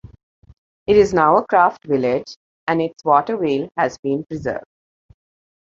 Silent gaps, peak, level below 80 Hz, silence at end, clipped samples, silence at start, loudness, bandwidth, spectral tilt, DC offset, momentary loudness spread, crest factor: 2.36-2.67 s, 3.99-4.03 s; -2 dBFS; -50 dBFS; 1 s; under 0.1%; 0.9 s; -18 LUFS; 7.6 kHz; -6.5 dB/octave; under 0.1%; 13 LU; 18 dB